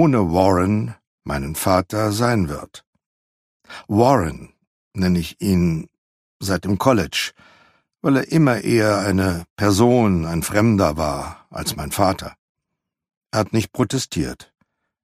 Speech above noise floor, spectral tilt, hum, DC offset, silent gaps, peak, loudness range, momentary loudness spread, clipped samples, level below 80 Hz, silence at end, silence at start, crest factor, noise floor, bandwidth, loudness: 62 dB; -6 dB/octave; none; under 0.1%; 1.07-1.18 s, 2.87-2.93 s, 3.06-3.60 s, 4.67-4.91 s, 5.98-6.40 s, 9.50-9.56 s, 12.39-12.55 s, 13.17-13.21 s; 0 dBFS; 6 LU; 13 LU; under 0.1%; -42 dBFS; 0.6 s; 0 s; 20 dB; -81 dBFS; 15.5 kHz; -19 LUFS